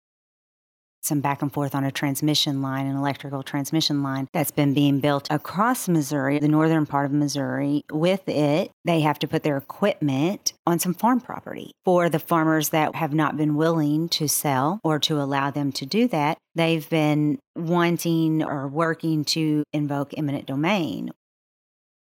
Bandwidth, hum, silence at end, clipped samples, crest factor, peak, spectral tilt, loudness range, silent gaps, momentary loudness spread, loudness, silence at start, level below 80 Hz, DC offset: 17.5 kHz; none; 1.1 s; under 0.1%; 18 dB; -6 dBFS; -5 dB/octave; 2 LU; 8.73-8.84 s, 10.59-10.65 s, 17.47-17.54 s; 6 LU; -23 LUFS; 1.05 s; -70 dBFS; under 0.1%